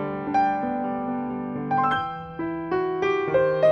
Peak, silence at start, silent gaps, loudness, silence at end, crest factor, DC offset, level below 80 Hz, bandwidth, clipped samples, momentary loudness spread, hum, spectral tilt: -8 dBFS; 0 s; none; -25 LUFS; 0 s; 16 dB; under 0.1%; -56 dBFS; 7 kHz; under 0.1%; 8 LU; none; -7.5 dB/octave